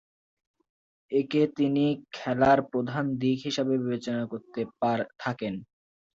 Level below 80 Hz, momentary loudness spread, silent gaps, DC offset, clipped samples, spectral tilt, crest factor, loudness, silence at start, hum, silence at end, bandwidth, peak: -62 dBFS; 11 LU; none; under 0.1%; under 0.1%; -6.5 dB/octave; 20 dB; -28 LUFS; 1.1 s; none; 0.5 s; 7.6 kHz; -8 dBFS